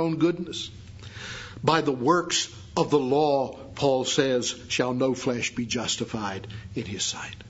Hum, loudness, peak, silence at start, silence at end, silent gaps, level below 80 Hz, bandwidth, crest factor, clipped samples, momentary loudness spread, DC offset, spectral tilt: none; -26 LUFS; -6 dBFS; 0 s; 0 s; none; -56 dBFS; 8 kHz; 22 dB; under 0.1%; 14 LU; under 0.1%; -4 dB/octave